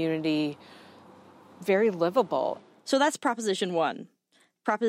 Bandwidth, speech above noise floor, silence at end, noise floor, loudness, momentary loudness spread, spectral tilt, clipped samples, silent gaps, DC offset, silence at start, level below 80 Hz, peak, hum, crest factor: 16 kHz; 40 dB; 0 s; -67 dBFS; -27 LUFS; 11 LU; -4.5 dB/octave; under 0.1%; none; under 0.1%; 0 s; -82 dBFS; -10 dBFS; none; 18 dB